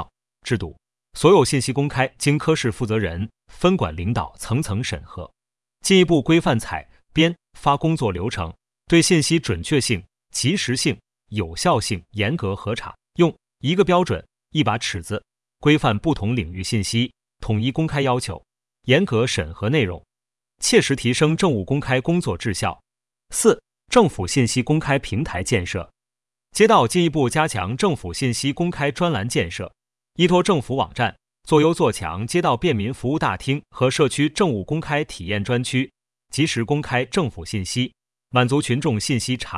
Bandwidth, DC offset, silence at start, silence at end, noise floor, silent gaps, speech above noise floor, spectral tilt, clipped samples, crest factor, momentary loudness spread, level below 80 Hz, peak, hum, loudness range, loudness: 12 kHz; under 0.1%; 0 s; 0 s; under -90 dBFS; none; over 70 dB; -5 dB/octave; under 0.1%; 20 dB; 11 LU; -46 dBFS; 0 dBFS; none; 3 LU; -21 LUFS